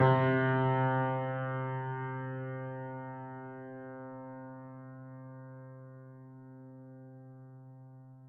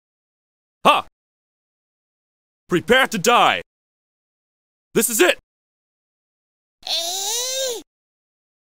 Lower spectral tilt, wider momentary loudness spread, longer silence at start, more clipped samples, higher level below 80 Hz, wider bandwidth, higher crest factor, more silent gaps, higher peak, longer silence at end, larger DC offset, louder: first, -6.5 dB/octave vs -2 dB/octave; first, 23 LU vs 10 LU; second, 0 s vs 0.85 s; neither; second, -80 dBFS vs -58 dBFS; second, 4.2 kHz vs 16.5 kHz; about the same, 22 dB vs 24 dB; second, none vs 1.12-2.67 s, 3.66-4.91 s, 5.43-6.78 s; second, -14 dBFS vs 0 dBFS; second, 0 s vs 0.85 s; second, under 0.1% vs 0.4%; second, -34 LUFS vs -18 LUFS